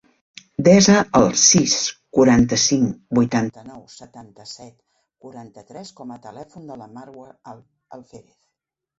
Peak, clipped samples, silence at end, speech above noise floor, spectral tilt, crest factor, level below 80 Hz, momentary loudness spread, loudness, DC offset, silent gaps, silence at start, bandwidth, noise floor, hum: -2 dBFS; under 0.1%; 0.85 s; 60 dB; -4 dB/octave; 20 dB; -48 dBFS; 26 LU; -16 LUFS; under 0.1%; none; 0.6 s; 8 kHz; -80 dBFS; none